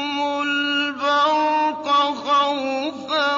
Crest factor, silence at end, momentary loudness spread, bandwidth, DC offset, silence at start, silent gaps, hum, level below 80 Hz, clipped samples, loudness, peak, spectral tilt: 12 dB; 0 s; 6 LU; 7.6 kHz; under 0.1%; 0 s; none; none; -72 dBFS; under 0.1%; -20 LUFS; -8 dBFS; -2.5 dB/octave